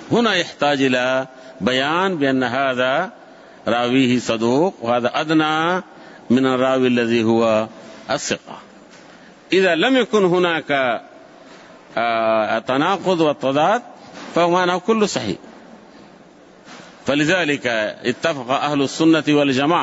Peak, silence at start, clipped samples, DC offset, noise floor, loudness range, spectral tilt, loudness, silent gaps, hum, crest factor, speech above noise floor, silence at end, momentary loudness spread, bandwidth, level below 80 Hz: -4 dBFS; 0 s; under 0.1%; under 0.1%; -46 dBFS; 3 LU; -5 dB/octave; -18 LUFS; none; none; 14 dB; 28 dB; 0 s; 9 LU; 8 kHz; -62 dBFS